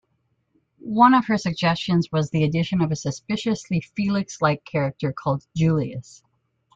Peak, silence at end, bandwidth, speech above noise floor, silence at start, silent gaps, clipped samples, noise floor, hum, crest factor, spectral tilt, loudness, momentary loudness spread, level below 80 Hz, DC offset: -2 dBFS; 0.75 s; 7.8 kHz; 49 dB; 0.85 s; none; under 0.1%; -70 dBFS; none; 20 dB; -6.5 dB/octave; -22 LUFS; 10 LU; -56 dBFS; under 0.1%